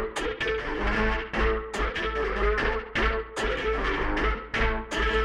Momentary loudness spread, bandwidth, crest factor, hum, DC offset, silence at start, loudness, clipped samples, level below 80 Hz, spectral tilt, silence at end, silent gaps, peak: 3 LU; 11 kHz; 16 dB; none; under 0.1%; 0 s; -27 LUFS; under 0.1%; -32 dBFS; -5 dB/octave; 0 s; none; -12 dBFS